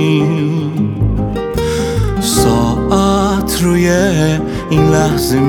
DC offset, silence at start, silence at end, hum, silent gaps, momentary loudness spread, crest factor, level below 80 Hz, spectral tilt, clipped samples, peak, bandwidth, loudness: under 0.1%; 0 s; 0 s; none; none; 5 LU; 12 dB; -26 dBFS; -5.5 dB/octave; under 0.1%; 0 dBFS; 18.5 kHz; -13 LUFS